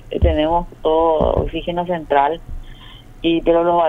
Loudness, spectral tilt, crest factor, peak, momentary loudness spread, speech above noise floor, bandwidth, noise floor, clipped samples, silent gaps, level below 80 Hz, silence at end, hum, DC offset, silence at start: -18 LUFS; -8.5 dB/octave; 16 dB; -2 dBFS; 8 LU; 22 dB; 4 kHz; -39 dBFS; under 0.1%; none; -28 dBFS; 0 s; none; under 0.1%; 0 s